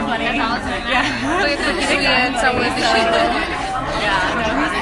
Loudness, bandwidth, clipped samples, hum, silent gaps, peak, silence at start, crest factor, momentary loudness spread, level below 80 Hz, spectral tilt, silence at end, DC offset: -17 LUFS; 11.5 kHz; under 0.1%; none; none; -2 dBFS; 0 s; 16 dB; 5 LU; -36 dBFS; -3.5 dB/octave; 0 s; under 0.1%